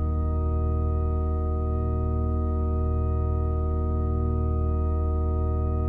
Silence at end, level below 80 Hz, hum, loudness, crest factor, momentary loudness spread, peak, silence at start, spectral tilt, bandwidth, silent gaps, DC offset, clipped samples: 0 s; -26 dBFS; none; -27 LUFS; 10 dB; 1 LU; -16 dBFS; 0 s; -13 dB/octave; 2.4 kHz; none; under 0.1%; under 0.1%